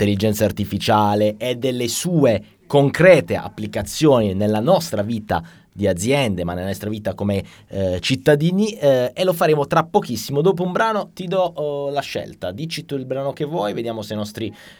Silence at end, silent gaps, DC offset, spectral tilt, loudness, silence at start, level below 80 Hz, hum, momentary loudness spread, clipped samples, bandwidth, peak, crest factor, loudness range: 0.05 s; none; under 0.1%; -5.5 dB/octave; -19 LUFS; 0 s; -50 dBFS; none; 10 LU; under 0.1%; over 20 kHz; 0 dBFS; 18 dB; 6 LU